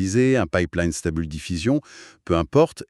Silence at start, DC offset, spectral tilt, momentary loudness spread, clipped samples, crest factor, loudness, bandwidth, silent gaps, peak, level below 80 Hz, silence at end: 0 s; under 0.1%; -6 dB/octave; 9 LU; under 0.1%; 18 dB; -22 LUFS; 12.5 kHz; none; -4 dBFS; -40 dBFS; 0.05 s